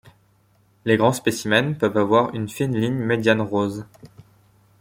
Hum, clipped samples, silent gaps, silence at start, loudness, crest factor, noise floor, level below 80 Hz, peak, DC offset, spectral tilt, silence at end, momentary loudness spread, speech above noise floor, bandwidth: none; under 0.1%; none; 0.85 s; -21 LUFS; 20 dB; -60 dBFS; -58 dBFS; -2 dBFS; under 0.1%; -5.5 dB/octave; 0.75 s; 7 LU; 39 dB; 16.5 kHz